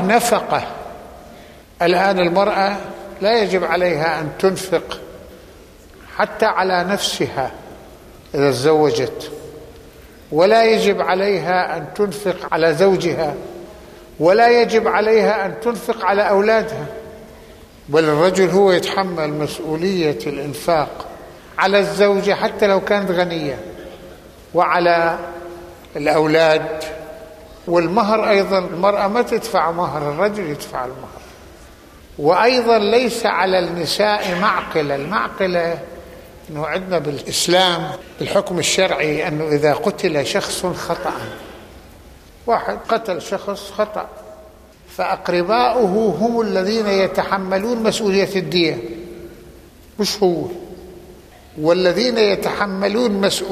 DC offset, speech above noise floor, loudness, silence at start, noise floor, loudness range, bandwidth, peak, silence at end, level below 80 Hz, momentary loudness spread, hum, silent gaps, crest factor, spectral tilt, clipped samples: under 0.1%; 26 dB; -17 LUFS; 0 s; -43 dBFS; 5 LU; 15 kHz; -2 dBFS; 0 s; -48 dBFS; 18 LU; none; none; 16 dB; -4.5 dB/octave; under 0.1%